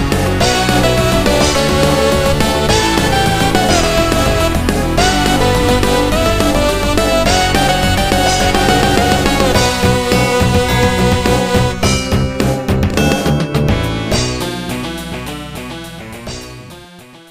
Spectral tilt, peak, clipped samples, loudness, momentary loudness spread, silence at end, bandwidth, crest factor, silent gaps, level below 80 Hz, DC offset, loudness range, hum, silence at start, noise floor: -4.5 dB/octave; 0 dBFS; under 0.1%; -13 LUFS; 11 LU; 0.15 s; 15.5 kHz; 12 dB; none; -22 dBFS; under 0.1%; 5 LU; none; 0 s; -37 dBFS